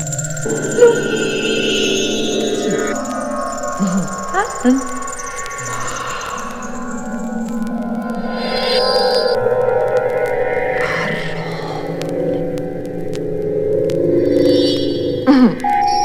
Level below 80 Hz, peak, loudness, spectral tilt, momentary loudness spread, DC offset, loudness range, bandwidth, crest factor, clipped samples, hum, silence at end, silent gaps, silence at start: -38 dBFS; 0 dBFS; -17 LUFS; -4.5 dB/octave; 11 LU; under 0.1%; 5 LU; 15.5 kHz; 16 dB; under 0.1%; none; 0 s; none; 0 s